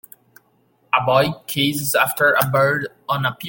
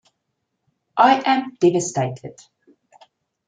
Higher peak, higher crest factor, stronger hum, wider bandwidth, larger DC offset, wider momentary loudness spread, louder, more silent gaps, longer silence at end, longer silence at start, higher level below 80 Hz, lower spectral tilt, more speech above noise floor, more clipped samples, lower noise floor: about the same, -2 dBFS vs -2 dBFS; about the same, 18 dB vs 20 dB; neither; first, 17 kHz vs 9.4 kHz; neither; second, 6 LU vs 17 LU; about the same, -18 LUFS vs -19 LUFS; neither; second, 0 s vs 1.15 s; about the same, 0.95 s vs 0.95 s; first, -58 dBFS vs -68 dBFS; about the same, -4 dB/octave vs -4.5 dB/octave; second, 42 dB vs 57 dB; neither; second, -61 dBFS vs -76 dBFS